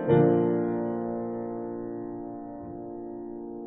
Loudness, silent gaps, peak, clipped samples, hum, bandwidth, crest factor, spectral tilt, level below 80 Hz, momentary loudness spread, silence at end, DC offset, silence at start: -30 LUFS; none; -10 dBFS; under 0.1%; none; 3.8 kHz; 18 dB; -7 dB/octave; -60 dBFS; 17 LU; 0 s; under 0.1%; 0 s